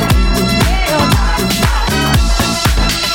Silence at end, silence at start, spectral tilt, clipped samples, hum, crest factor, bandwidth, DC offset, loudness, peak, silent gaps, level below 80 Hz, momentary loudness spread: 0 s; 0 s; -4 dB/octave; under 0.1%; none; 12 dB; 18 kHz; under 0.1%; -13 LUFS; 0 dBFS; none; -16 dBFS; 1 LU